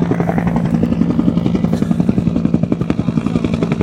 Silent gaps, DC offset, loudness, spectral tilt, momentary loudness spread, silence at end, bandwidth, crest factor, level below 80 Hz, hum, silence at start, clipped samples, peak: none; under 0.1%; -16 LUFS; -9 dB/octave; 2 LU; 0 s; 9 kHz; 14 dB; -34 dBFS; none; 0 s; under 0.1%; 0 dBFS